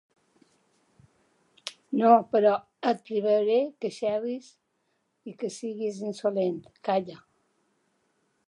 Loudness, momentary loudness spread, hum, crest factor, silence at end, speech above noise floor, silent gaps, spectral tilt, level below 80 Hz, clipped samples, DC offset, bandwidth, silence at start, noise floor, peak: -27 LUFS; 20 LU; none; 22 dB; 1.3 s; 49 dB; none; -6 dB/octave; -80 dBFS; under 0.1%; under 0.1%; 11.5 kHz; 1.65 s; -75 dBFS; -6 dBFS